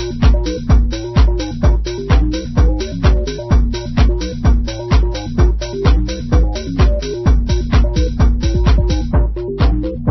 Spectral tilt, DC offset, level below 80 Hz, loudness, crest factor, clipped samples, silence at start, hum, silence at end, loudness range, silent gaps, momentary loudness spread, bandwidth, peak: -7 dB/octave; under 0.1%; -14 dBFS; -16 LUFS; 14 dB; under 0.1%; 0 s; none; 0 s; 1 LU; none; 3 LU; 6.2 kHz; 0 dBFS